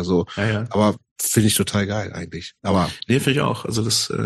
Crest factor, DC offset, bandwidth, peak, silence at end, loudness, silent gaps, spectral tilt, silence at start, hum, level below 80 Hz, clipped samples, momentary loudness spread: 18 dB; under 0.1%; 12.5 kHz; -4 dBFS; 0 s; -21 LUFS; 1.11-1.16 s; -4.5 dB/octave; 0 s; none; -48 dBFS; under 0.1%; 9 LU